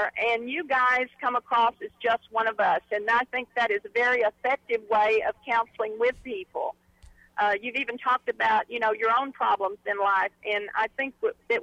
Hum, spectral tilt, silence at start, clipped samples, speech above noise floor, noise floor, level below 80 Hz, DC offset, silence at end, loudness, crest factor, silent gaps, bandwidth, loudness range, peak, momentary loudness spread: none; -3.5 dB/octave; 0 s; under 0.1%; 28 dB; -55 dBFS; -64 dBFS; under 0.1%; 0 s; -26 LUFS; 12 dB; none; 9.4 kHz; 3 LU; -14 dBFS; 6 LU